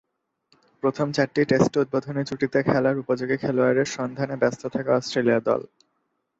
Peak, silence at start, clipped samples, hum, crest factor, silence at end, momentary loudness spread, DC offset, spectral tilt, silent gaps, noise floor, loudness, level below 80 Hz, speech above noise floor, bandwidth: -4 dBFS; 0.85 s; under 0.1%; none; 20 dB; 0.75 s; 7 LU; under 0.1%; -6 dB/octave; none; -74 dBFS; -23 LUFS; -60 dBFS; 52 dB; 8 kHz